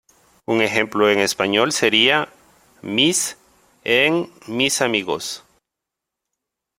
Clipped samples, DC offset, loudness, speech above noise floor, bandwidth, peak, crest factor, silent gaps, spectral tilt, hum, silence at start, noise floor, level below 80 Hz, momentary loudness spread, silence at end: under 0.1%; under 0.1%; -18 LUFS; 65 dB; 16.5 kHz; 0 dBFS; 20 dB; none; -2.5 dB/octave; none; 0.5 s; -83 dBFS; -62 dBFS; 15 LU; 1.4 s